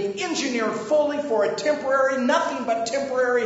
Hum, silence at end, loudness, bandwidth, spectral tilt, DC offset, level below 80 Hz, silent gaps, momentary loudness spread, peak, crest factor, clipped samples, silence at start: none; 0 s; -23 LUFS; 8 kHz; -3 dB/octave; under 0.1%; -66 dBFS; none; 4 LU; -8 dBFS; 16 dB; under 0.1%; 0 s